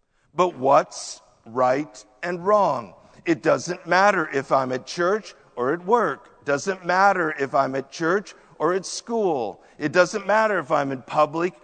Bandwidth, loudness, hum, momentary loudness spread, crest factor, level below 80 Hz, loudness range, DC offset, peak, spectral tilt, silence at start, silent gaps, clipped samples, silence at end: 9.4 kHz; -22 LUFS; none; 13 LU; 20 dB; -66 dBFS; 1 LU; under 0.1%; -2 dBFS; -4.5 dB/octave; 0.35 s; none; under 0.1%; 0.15 s